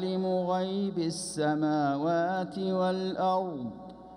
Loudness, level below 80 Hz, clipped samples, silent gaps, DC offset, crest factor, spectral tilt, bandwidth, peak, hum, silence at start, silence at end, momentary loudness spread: -30 LUFS; -66 dBFS; under 0.1%; none; under 0.1%; 12 dB; -6 dB/octave; 14 kHz; -18 dBFS; none; 0 s; 0 s; 6 LU